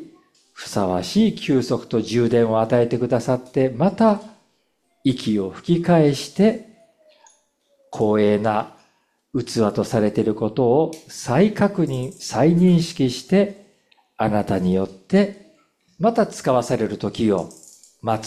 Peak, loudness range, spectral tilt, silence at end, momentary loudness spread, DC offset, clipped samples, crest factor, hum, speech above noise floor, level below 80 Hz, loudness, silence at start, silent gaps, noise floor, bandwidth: -6 dBFS; 3 LU; -6.5 dB/octave; 0 s; 8 LU; under 0.1%; under 0.1%; 16 dB; none; 48 dB; -52 dBFS; -20 LUFS; 0 s; none; -67 dBFS; 13.5 kHz